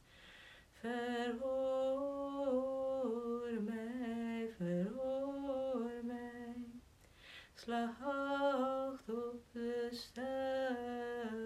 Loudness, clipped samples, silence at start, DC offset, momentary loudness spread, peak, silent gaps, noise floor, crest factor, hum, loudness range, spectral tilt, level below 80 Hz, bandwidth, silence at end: -41 LUFS; under 0.1%; 0.1 s; under 0.1%; 14 LU; -26 dBFS; none; -63 dBFS; 14 dB; none; 4 LU; -6.5 dB/octave; -70 dBFS; 14 kHz; 0 s